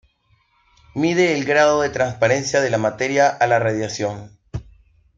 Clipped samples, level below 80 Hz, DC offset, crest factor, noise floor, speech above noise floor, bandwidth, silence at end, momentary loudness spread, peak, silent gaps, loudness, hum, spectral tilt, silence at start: under 0.1%; -50 dBFS; under 0.1%; 18 dB; -62 dBFS; 43 dB; 7.8 kHz; 0.55 s; 18 LU; -2 dBFS; none; -18 LUFS; none; -4.5 dB/octave; 0.95 s